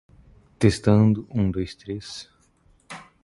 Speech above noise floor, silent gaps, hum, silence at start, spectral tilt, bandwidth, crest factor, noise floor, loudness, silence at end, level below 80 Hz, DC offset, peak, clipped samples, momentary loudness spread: 38 dB; none; none; 0.6 s; -7 dB/octave; 11.5 kHz; 22 dB; -60 dBFS; -23 LUFS; 0.25 s; -44 dBFS; under 0.1%; -2 dBFS; under 0.1%; 23 LU